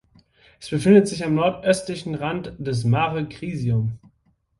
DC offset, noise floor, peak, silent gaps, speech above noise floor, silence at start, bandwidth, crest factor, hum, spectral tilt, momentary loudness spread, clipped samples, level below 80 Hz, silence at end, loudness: under 0.1%; -65 dBFS; -4 dBFS; none; 44 dB; 0.6 s; 11.5 kHz; 18 dB; none; -6.5 dB/octave; 14 LU; under 0.1%; -52 dBFS; 0.6 s; -22 LUFS